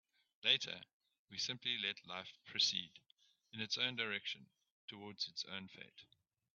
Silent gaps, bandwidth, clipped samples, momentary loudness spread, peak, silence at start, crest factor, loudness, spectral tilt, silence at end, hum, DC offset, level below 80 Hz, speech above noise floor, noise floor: 0.93-1.00 s, 1.19-1.28 s, 4.71-4.88 s; 7.4 kHz; under 0.1%; 20 LU; -18 dBFS; 0.45 s; 26 dB; -40 LUFS; 0.5 dB/octave; 0.5 s; none; under 0.1%; -88 dBFS; 29 dB; -72 dBFS